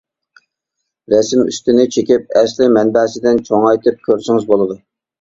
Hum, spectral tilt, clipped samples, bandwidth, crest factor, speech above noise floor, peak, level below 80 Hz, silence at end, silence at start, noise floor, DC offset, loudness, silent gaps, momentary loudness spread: none; -5 dB/octave; under 0.1%; 7.8 kHz; 14 dB; 63 dB; 0 dBFS; -54 dBFS; 0.45 s; 1.1 s; -76 dBFS; under 0.1%; -13 LUFS; none; 3 LU